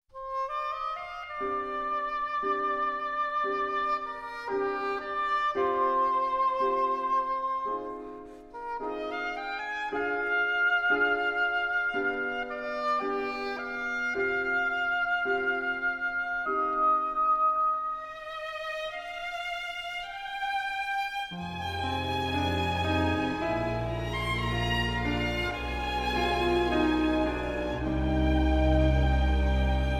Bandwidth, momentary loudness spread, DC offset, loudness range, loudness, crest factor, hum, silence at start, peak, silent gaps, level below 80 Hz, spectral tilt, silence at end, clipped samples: 13.5 kHz; 9 LU; under 0.1%; 5 LU; -29 LUFS; 16 dB; none; 0.15 s; -12 dBFS; none; -38 dBFS; -6 dB/octave; 0 s; under 0.1%